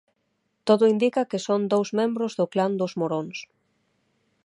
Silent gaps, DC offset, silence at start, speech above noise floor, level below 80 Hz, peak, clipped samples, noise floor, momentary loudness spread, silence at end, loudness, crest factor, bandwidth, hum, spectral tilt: none; under 0.1%; 0.65 s; 51 dB; -78 dBFS; -6 dBFS; under 0.1%; -74 dBFS; 11 LU; 1 s; -24 LUFS; 20 dB; 11 kHz; none; -6 dB/octave